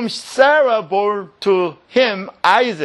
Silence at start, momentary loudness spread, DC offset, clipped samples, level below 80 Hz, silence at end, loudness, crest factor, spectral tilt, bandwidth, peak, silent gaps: 0 s; 8 LU; under 0.1%; under 0.1%; -68 dBFS; 0 s; -16 LUFS; 16 dB; -4 dB/octave; 12 kHz; 0 dBFS; none